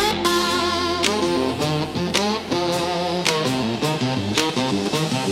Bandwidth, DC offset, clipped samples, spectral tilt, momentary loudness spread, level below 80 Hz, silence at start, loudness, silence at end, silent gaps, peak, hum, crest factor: 17 kHz; under 0.1%; under 0.1%; -4 dB/octave; 3 LU; -52 dBFS; 0 s; -21 LUFS; 0 s; none; -2 dBFS; none; 20 dB